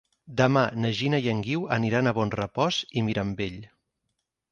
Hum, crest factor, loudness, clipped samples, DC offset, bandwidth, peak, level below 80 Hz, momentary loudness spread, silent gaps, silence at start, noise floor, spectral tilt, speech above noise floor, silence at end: none; 22 dB; -26 LUFS; under 0.1%; under 0.1%; 7.4 kHz; -6 dBFS; -56 dBFS; 9 LU; none; 0.3 s; -80 dBFS; -6 dB/octave; 55 dB; 0.85 s